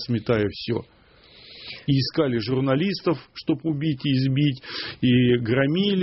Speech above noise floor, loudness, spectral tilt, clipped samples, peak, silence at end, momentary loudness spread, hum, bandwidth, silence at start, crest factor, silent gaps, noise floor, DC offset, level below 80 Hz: 29 dB; -23 LUFS; -5.5 dB/octave; under 0.1%; -8 dBFS; 0 s; 10 LU; none; 6 kHz; 0 s; 16 dB; none; -51 dBFS; under 0.1%; -54 dBFS